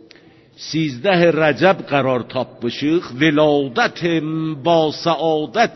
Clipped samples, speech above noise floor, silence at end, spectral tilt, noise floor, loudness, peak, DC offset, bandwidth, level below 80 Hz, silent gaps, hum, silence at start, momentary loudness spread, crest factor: under 0.1%; 30 dB; 0 s; -6 dB/octave; -47 dBFS; -17 LUFS; -2 dBFS; under 0.1%; 6.2 kHz; -56 dBFS; none; none; 0.6 s; 9 LU; 16 dB